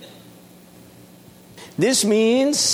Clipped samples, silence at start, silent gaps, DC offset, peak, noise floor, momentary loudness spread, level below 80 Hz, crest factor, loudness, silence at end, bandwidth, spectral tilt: under 0.1%; 0 s; none; under 0.1%; -6 dBFS; -46 dBFS; 7 LU; -64 dBFS; 16 dB; -18 LUFS; 0 s; 19.5 kHz; -3 dB/octave